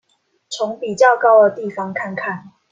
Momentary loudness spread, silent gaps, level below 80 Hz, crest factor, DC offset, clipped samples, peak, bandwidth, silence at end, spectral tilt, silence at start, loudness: 15 LU; none; -70 dBFS; 16 dB; under 0.1%; under 0.1%; -2 dBFS; 9.2 kHz; 0.25 s; -4.5 dB/octave; 0.5 s; -16 LUFS